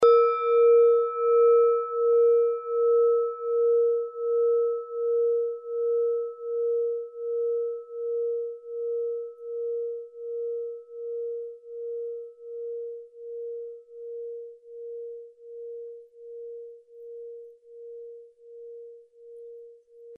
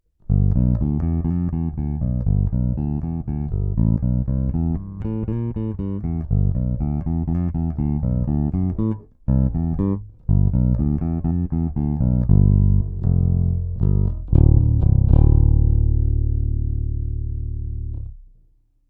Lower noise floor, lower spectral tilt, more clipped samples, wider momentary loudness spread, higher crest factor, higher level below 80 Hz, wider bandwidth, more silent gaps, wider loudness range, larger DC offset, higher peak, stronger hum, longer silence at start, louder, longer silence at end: second, -49 dBFS vs -57 dBFS; second, -4.5 dB/octave vs -14.5 dB/octave; neither; first, 23 LU vs 10 LU; about the same, 18 dB vs 16 dB; second, -84 dBFS vs -24 dBFS; first, 5.2 kHz vs 2.3 kHz; neither; first, 20 LU vs 6 LU; neither; second, -10 dBFS vs -2 dBFS; neither; second, 0 s vs 0.3 s; second, -26 LUFS vs -21 LUFS; second, 0 s vs 0.65 s